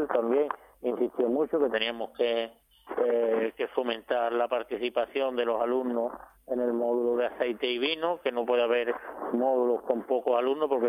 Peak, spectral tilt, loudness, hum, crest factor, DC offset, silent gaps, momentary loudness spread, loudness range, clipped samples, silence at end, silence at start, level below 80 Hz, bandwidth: -12 dBFS; -5.5 dB/octave; -29 LUFS; none; 16 dB; under 0.1%; none; 7 LU; 2 LU; under 0.1%; 0 s; 0 s; -68 dBFS; 14.5 kHz